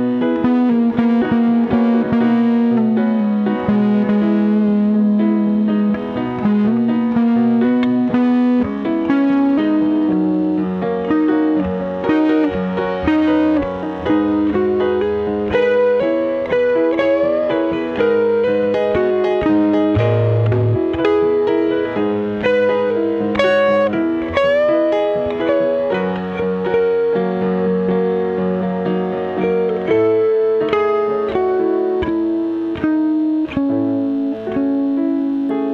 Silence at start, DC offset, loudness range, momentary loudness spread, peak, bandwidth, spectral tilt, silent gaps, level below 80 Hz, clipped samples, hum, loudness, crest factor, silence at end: 0 s; under 0.1%; 2 LU; 5 LU; -2 dBFS; 6.4 kHz; -9 dB/octave; none; -46 dBFS; under 0.1%; none; -16 LUFS; 14 dB; 0 s